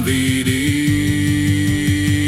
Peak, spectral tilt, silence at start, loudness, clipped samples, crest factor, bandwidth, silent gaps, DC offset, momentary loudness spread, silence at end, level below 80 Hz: -4 dBFS; -5 dB/octave; 0 s; -17 LUFS; under 0.1%; 12 dB; 15.5 kHz; none; under 0.1%; 1 LU; 0 s; -36 dBFS